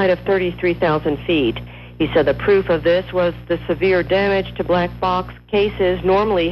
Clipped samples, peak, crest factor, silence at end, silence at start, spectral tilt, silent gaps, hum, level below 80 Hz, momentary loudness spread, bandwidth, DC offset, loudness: under 0.1%; -6 dBFS; 12 dB; 0 s; 0 s; -8 dB/octave; none; none; -38 dBFS; 6 LU; 12.5 kHz; under 0.1%; -18 LUFS